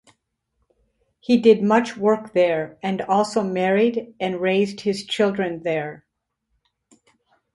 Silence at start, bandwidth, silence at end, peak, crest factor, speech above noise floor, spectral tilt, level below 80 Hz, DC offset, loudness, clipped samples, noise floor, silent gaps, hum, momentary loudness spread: 1.3 s; 11.5 kHz; 1.6 s; -2 dBFS; 20 dB; 55 dB; -6 dB/octave; -64 dBFS; under 0.1%; -21 LUFS; under 0.1%; -75 dBFS; none; none; 10 LU